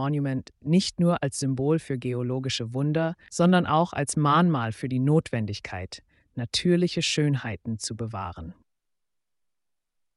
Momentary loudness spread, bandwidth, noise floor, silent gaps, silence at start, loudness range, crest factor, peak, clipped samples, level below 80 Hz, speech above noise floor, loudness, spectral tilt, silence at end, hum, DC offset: 14 LU; 11.5 kHz; -87 dBFS; none; 0 s; 4 LU; 18 dB; -8 dBFS; under 0.1%; -56 dBFS; 61 dB; -25 LUFS; -5.5 dB/octave; 1.65 s; none; under 0.1%